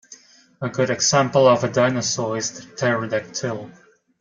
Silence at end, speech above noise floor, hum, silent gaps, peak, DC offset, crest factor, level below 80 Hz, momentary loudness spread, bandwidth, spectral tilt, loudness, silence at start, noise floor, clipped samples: 0.5 s; 28 dB; none; none; -2 dBFS; under 0.1%; 18 dB; -62 dBFS; 12 LU; 9.4 kHz; -4 dB/octave; -20 LUFS; 0.1 s; -48 dBFS; under 0.1%